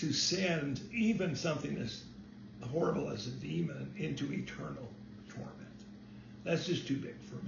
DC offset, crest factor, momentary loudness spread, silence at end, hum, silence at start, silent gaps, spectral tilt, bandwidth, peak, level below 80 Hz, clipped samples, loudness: under 0.1%; 18 dB; 19 LU; 0 s; none; 0 s; none; -4.5 dB/octave; 7 kHz; -18 dBFS; -64 dBFS; under 0.1%; -36 LUFS